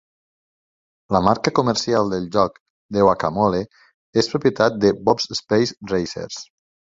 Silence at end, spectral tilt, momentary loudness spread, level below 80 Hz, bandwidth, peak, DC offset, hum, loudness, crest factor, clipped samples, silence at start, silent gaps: 0.4 s; -5 dB/octave; 9 LU; -50 dBFS; 7.8 kHz; -2 dBFS; under 0.1%; none; -20 LUFS; 20 dB; under 0.1%; 1.1 s; 2.60-2.89 s, 3.94-4.13 s